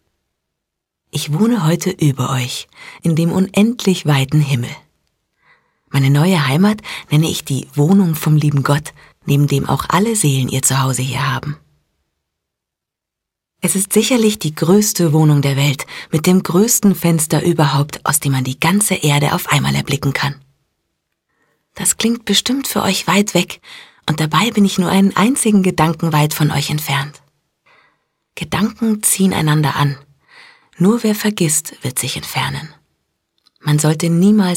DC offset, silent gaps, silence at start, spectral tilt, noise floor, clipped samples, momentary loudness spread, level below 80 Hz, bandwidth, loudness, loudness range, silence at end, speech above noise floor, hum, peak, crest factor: under 0.1%; none; 1.15 s; -5 dB/octave; -82 dBFS; under 0.1%; 9 LU; -50 dBFS; 16.5 kHz; -15 LUFS; 5 LU; 0 s; 67 dB; none; 0 dBFS; 14 dB